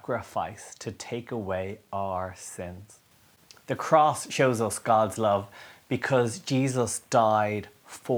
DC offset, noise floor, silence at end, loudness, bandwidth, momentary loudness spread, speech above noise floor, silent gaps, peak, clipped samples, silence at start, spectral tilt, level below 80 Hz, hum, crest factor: under 0.1%; -58 dBFS; 0 s; -27 LUFS; over 20 kHz; 16 LU; 31 dB; none; -6 dBFS; under 0.1%; 0.1 s; -5 dB/octave; -66 dBFS; none; 22 dB